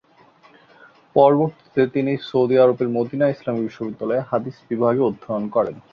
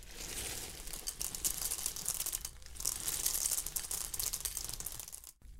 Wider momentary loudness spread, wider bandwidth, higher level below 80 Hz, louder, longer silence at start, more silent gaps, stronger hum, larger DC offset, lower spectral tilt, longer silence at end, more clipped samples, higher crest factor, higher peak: about the same, 10 LU vs 10 LU; second, 6.4 kHz vs 16.5 kHz; second, -62 dBFS vs -52 dBFS; first, -20 LUFS vs -37 LUFS; first, 1.15 s vs 0 s; neither; neither; neither; first, -9 dB/octave vs 0 dB/octave; first, 0.15 s vs 0 s; neither; second, 18 dB vs 28 dB; first, -2 dBFS vs -12 dBFS